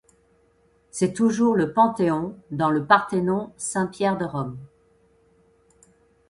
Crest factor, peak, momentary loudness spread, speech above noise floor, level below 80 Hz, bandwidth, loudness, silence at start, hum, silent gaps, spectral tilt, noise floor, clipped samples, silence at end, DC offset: 22 dB; -2 dBFS; 12 LU; 40 dB; -60 dBFS; 11.5 kHz; -23 LUFS; 0.95 s; none; none; -5.5 dB/octave; -62 dBFS; under 0.1%; 1.65 s; under 0.1%